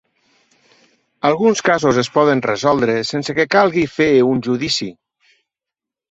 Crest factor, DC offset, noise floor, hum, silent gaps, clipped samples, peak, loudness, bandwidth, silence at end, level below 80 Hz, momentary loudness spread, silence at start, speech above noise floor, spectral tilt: 16 dB; under 0.1%; -86 dBFS; none; none; under 0.1%; -2 dBFS; -16 LUFS; 8.2 kHz; 1.2 s; -54 dBFS; 6 LU; 1.25 s; 70 dB; -5 dB/octave